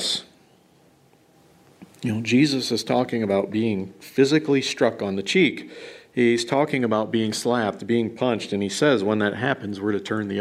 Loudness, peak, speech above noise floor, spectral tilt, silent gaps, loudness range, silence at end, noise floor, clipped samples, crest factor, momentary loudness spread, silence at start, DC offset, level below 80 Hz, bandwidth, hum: -23 LUFS; -6 dBFS; 35 dB; -5 dB/octave; none; 2 LU; 0 s; -57 dBFS; under 0.1%; 18 dB; 8 LU; 0 s; under 0.1%; -66 dBFS; 15 kHz; none